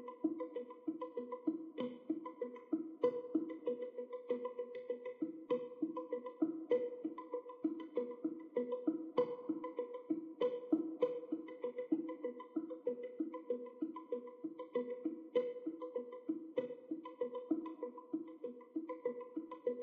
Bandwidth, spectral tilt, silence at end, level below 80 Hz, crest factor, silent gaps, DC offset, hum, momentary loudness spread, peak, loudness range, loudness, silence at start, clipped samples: 4.8 kHz; -5.5 dB/octave; 0 s; under -90 dBFS; 22 dB; none; under 0.1%; none; 8 LU; -20 dBFS; 4 LU; -43 LUFS; 0 s; under 0.1%